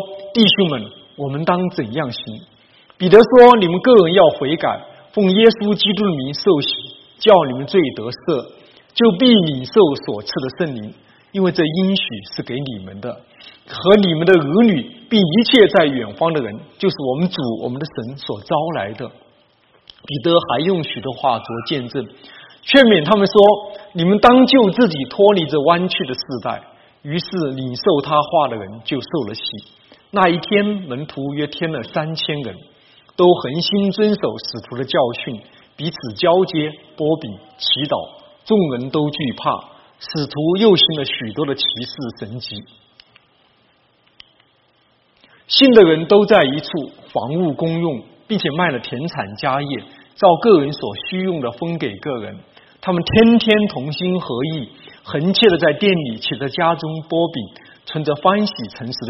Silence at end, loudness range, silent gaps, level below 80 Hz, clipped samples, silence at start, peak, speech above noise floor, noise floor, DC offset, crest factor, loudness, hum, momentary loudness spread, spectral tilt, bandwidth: 0 s; 8 LU; none; -52 dBFS; under 0.1%; 0 s; 0 dBFS; 42 dB; -58 dBFS; under 0.1%; 16 dB; -16 LUFS; none; 17 LU; -4 dB/octave; 6.2 kHz